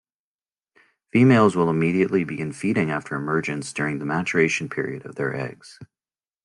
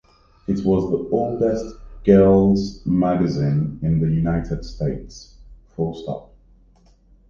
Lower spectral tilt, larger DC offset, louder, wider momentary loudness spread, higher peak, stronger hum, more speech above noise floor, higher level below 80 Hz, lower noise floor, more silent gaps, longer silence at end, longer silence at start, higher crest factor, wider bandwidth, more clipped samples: second, -6.5 dB/octave vs -9 dB/octave; neither; about the same, -22 LUFS vs -20 LUFS; second, 12 LU vs 18 LU; about the same, -4 dBFS vs -2 dBFS; neither; first, over 68 dB vs 34 dB; second, -62 dBFS vs -38 dBFS; first, under -90 dBFS vs -53 dBFS; neither; second, 0.6 s vs 1.1 s; first, 1.15 s vs 0.5 s; about the same, 18 dB vs 18 dB; first, 11 kHz vs 7.2 kHz; neither